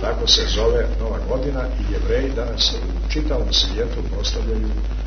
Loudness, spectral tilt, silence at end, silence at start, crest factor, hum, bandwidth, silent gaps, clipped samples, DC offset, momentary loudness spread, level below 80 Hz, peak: -21 LUFS; -4 dB/octave; 0 s; 0 s; 18 dB; none; 6.6 kHz; none; under 0.1%; under 0.1%; 9 LU; -22 dBFS; -2 dBFS